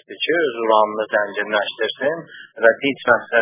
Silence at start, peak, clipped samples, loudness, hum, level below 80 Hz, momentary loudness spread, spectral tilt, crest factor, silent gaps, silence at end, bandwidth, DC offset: 0.1 s; 0 dBFS; under 0.1%; -19 LUFS; none; -66 dBFS; 7 LU; -7.5 dB/octave; 20 dB; none; 0 s; 3.8 kHz; under 0.1%